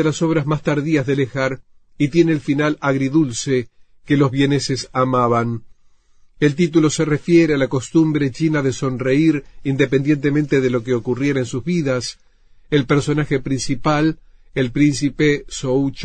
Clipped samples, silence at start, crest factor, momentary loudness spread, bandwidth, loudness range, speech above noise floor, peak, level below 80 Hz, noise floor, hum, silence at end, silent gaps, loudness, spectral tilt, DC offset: under 0.1%; 0 s; 16 dB; 6 LU; 9.4 kHz; 3 LU; 33 dB; -2 dBFS; -44 dBFS; -51 dBFS; none; 0 s; none; -18 LUFS; -6 dB/octave; under 0.1%